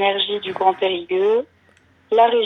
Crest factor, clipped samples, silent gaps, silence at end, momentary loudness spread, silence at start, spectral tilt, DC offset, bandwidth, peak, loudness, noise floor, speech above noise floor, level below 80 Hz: 16 dB; under 0.1%; none; 0 s; 6 LU; 0 s; -5.5 dB/octave; under 0.1%; 6.2 kHz; -4 dBFS; -19 LUFS; -55 dBFS; 38 dB; -72 dBFS